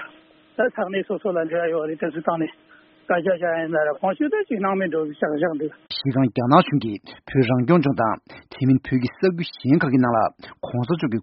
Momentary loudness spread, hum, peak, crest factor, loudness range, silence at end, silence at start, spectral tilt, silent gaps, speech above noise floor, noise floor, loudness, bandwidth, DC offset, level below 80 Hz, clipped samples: 10 LU; none; 0 dBFS; 22 dB; 4 LU; 0 s; 0 s; -6 dB/octave; none; 30 dB; -52 dBFS; -22 LUFS; 5.8 kHz; under 0.1%; -58 dBFS; under 0.1%